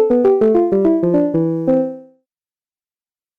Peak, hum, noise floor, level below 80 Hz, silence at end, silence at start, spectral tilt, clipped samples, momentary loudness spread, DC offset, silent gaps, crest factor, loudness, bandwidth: -6 dBFS; none; under -90 dBFS; -50 dBFS; 1.35 s; 0 s; -11 dB/octave; under 0.1%; 5 LU; under 0.1%; none; 10 dB; -15 LUFS; 4.2 kHz